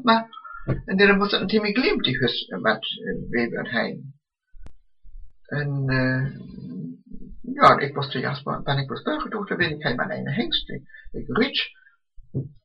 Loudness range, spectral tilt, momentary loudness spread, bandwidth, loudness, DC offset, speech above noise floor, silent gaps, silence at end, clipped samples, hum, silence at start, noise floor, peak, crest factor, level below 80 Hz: 7 LU; -7 dB/octave; 19 LU; 8 kHz; -23 LUFS; under 0.1%; 24 dB; none; 0.15 s; under 0.1%; none; 0 s; -47 dBFS; -2 dBFS; 22 dB; -46 dBFS